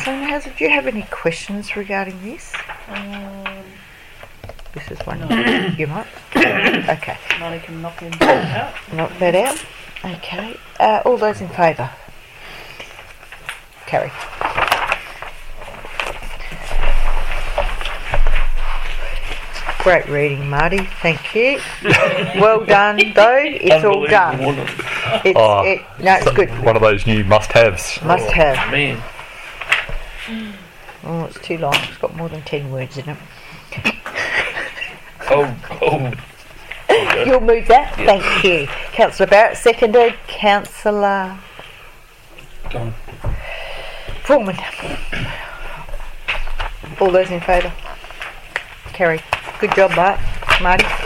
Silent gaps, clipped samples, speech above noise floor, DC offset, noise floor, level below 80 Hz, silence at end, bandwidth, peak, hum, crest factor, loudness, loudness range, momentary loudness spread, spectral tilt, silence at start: none; under 0.1%; 25 dB; under 0.1%; -41 dBFS; -26 dBFS; 0 s; 15 kHz; 0 dBFS; none; 16 dB; -16 LUFS; 11 LU; 19 LU; -5 dB/octave; 0 s